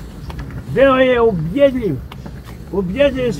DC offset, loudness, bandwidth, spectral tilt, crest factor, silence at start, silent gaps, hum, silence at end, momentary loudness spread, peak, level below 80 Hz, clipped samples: under 0.1%; -15 LUFS; 15 kHz; -7 dB/octave; 16 dB; 0 s; none; none; 0 s; 20 LU; 0 dBFS; -34 dBFS; under 0.1%